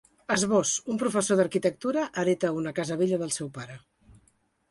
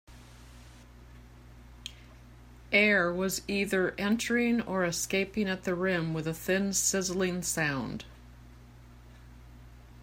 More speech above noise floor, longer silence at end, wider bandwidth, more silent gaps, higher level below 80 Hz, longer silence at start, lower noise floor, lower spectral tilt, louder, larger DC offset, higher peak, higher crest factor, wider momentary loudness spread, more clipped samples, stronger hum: first, 41 dB vs 23 dB; first, 0.9 s vs 0 s; second, 11.5 kHz vs 16 kHz; neither; second, -66 dBFS vs -54 dBFS; first, 0.3 s vs 0.1 s; first, -68 dBFS vs -52 dBFS; about the same, -4 dB/octave vs -3.5 dB/octave; about the same, -27 LUFS vs -29 LUFS; neither; about the same, -10 dBFS vs -10 dBFS; about the same, 18 dB vs 22 dB; second, 8 LU vs 15 LU; neither; neither